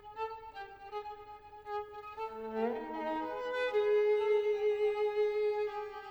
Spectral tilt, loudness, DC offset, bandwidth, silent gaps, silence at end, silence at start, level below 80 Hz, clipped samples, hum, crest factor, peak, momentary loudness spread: -5 dB/octave; -34 LUFS; under 0.1%; 6.6 kHz; none; 0 s; 0 s; -68 dBFS; under 0.1%; none; 14 dB; -22 dBFS; 17 LU